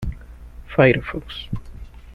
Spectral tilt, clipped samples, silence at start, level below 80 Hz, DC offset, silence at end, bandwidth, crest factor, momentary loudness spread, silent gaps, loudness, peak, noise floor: -8 dB/octave; under 0.1%; 0 s; -36 dBFS; under 0.1%; 0 s; 12 kHz; 20 dB; 25 LU; none; -20 LUFS; -2 dBFS; -39 dBFS